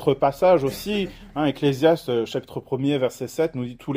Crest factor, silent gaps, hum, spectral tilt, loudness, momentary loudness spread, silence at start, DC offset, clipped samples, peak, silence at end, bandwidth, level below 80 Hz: 18 dB; none; none; -6.5 dB/octave; -23 LUFS; 11 LU; 0 s; under 0.1%; under 0.1%; -6 dBFS; 0 s; 16 kHz; -52 dBFS